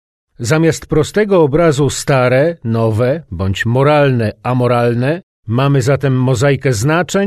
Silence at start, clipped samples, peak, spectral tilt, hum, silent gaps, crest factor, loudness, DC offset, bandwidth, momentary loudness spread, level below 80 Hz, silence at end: 0.4 s; under 0.1%; 0 dBFS; -6 dB/octave; none; 5.23-5.43 s; 12 dB; -13 LUFS; under 0.1%; 13.5 kHz; 6 LU; -38 dBFS; 0 s